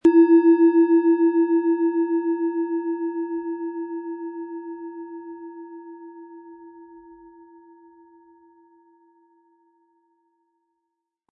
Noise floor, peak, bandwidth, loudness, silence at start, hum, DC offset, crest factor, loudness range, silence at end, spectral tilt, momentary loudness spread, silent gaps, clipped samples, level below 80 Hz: -81 dBFS; -6 dBFS; 2.8 kHz; -20 LUFS; 0.05 s; none; under 0.1%; 16 dB; 24 LU; 4.3 s; -7.5 dB/octave; 25 LU; none; under 0.1%; -72 dBFS